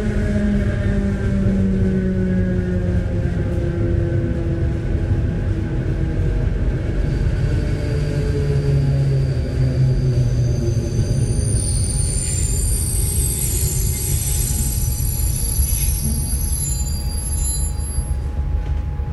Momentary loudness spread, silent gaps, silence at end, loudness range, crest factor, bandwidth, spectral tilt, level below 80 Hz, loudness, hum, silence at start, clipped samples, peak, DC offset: 4 LU; none; 0 s; 2 LU; 12 dB; 16 kHz; -5.5 dB/octave; -22 dBFS; -20 LUFS; none; 0 s; under 0.1%; -6 dBFS; under 0.1%